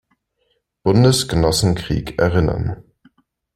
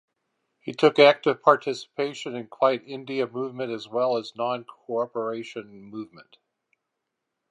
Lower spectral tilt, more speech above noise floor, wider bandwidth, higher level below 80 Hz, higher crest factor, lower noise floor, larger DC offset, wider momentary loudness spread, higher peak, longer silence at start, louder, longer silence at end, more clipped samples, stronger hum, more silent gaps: about the same, -5.5 dB/octave vs -5 dB/octave; second, 52 dB vs 57 dB; first, 16.5 kHz vs 10.5 kHz; first, -36 dBFS vs -80 dBFS; about the same, 18 dB vs 22 dB; second, -68 dBFS vs -82 dBFS; neither; second, 11 LU vs 21 LU; about the same, -2 dBFS vs -2 dBFS; first, 0.85 s vs 0.65 s; first, -17 LUFS vs -24 LUFS; second, 0.75 s vs 1.3 s; neither; neither; neither